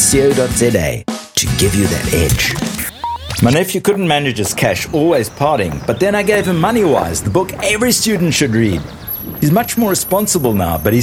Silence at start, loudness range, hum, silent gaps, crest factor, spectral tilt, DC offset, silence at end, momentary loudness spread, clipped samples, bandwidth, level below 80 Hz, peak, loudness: 0 s; 1 LU; none; none; 14 dB; -4.5 dB/octave; under 0.1%; 0 s; 7 LU; under 0.1%; over 20 kHz; -32 dBFS; 0 dBFS; -14 LUFS